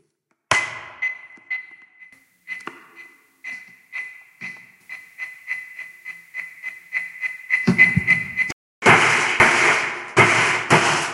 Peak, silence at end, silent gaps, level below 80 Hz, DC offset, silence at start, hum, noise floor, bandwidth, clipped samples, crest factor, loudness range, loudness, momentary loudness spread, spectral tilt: 0 dBFS; 0 s; 8.52-8.82 s; -54 dBFS; under 0.1%; 0.5 s; none; -70 dBFS; 16 kHz; under 0.1%; 22 dB; 19 LU; -18 LUFS; 22 LU; -3.5 dB/octave